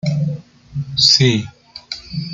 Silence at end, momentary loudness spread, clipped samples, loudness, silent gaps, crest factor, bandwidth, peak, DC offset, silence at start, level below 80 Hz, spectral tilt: 0 s; 20 LU; under 0.1%; -14 LUFS; none; 18 dB; 9.2 kHz; 0 dBFS; under 0.1%; 0.05 s; -50 dBFS; -4 dB/octave